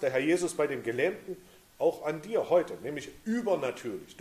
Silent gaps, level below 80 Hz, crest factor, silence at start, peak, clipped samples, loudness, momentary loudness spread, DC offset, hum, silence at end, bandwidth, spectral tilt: none; -68 dBFS; 16 dB; 0 s; -14 dBFS; under 0.1%; -31 LUFS; 12 LU; under 0.1%; none; 0.1 s; 15 kHz; -5 dB/octave